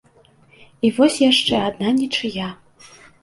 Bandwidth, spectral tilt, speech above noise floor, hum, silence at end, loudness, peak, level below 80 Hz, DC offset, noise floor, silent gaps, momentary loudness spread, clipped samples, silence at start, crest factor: 11.5 kHz; -4 dB/octave; 36 dB; none; 0.7 s; -18 LUFS; -2 dBFS; -56 dBFS; under 0.1%; -53 dBFS; none; 12 LU; under 0.1%; 0.85 s; 18 dB